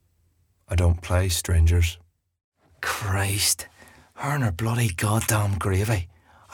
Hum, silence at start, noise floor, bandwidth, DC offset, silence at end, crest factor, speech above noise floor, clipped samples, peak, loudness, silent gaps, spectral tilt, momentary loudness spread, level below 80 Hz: none; 0.7 s; -65 dBFS; 18.5 kHz; under 0.1%; 0.45 s; 18 dB; 43 dB; under 0.1%; -6 dBFS; -24 LUFS; 2.44-2.52 s; -4.5 dB/octave; 8 LU; -38 dBFS